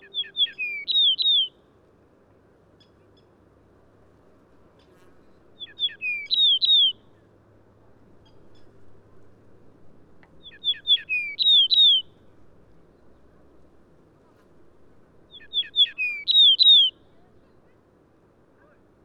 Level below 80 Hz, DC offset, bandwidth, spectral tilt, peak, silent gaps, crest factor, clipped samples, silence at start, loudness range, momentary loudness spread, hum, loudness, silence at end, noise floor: -66 dBFS; under 0.1%; 12 kHz; -0.5 dB/octave; -8 dBFS; none; 18 dB; under 0.1%; 0.15 s; 12 LU; 15 LU; none; -18 LUFS; 2.15 s; -59 dBFS